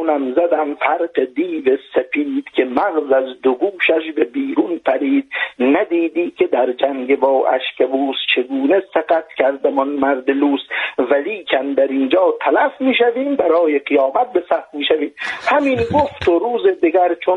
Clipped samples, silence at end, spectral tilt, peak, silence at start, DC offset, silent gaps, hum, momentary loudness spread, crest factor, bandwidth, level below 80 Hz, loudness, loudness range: under 0.1%; 0 s; -6 dB/octave; 0 dBFS; 0 s; under 0.1%; none; none; 4 LU; 16 dB; 7.4 kHz; -54 dBFS; -17 LUFS; 2 LU